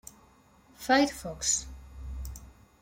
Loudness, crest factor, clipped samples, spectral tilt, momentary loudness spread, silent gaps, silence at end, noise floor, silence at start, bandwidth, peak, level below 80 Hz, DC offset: -27 LUFS; 20 dB; under 0.1%; -2.5 dB/octave; 22 LU; none; 0.3 s; -60 dBFS; 0.05 s; 16.5 kHz; -12 dBFS; -46 dBFS; under 0.1%